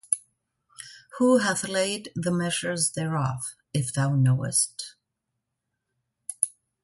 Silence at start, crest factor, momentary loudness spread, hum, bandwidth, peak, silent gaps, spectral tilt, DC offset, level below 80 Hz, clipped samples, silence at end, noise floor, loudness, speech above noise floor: 0.1 s; 24 dB; 18 LU; none; 12 kHz; -4 dBFS; none; -4.5 dB/octave; under 0.1%; -64 dBFS; under 0.1%; 0.35 s; -82 dBFS; -25 LUFS; 57 dB